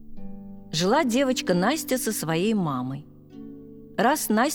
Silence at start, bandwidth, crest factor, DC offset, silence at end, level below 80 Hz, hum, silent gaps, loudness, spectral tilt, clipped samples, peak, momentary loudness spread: 0 s; over 20 kHz; 16 dB; under 0.1%; 0 s; -50 dBFS; none; none; -24 LUFS; -4.5 dB/octave; under 0.1%; -8 dBFS; 21 LU